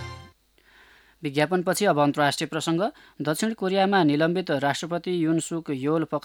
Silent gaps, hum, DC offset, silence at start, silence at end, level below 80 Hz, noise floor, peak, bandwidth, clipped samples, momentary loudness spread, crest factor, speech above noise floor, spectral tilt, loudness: none; none; under 0.1%; 0 s; 0.05 s; -64 dBFS; -59 dBFS; -6 dBFS; 18 kHz; under 0.1%; 9 LU; 18 dB; 35 dB; -5 dB/octave; -24 LUFS